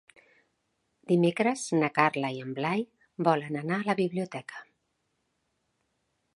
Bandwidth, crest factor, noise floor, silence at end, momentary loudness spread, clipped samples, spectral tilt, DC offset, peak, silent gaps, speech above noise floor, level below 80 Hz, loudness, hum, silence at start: 11.5 kHz; 26 dB; -78 dBFS; 1.75 s; 13 LU; under 0.1%; -6 dB/octave; under 0.1%; -6 dBFS; none; 50 dB; -78 dBFS; -28 LUFS; none; 1.1 s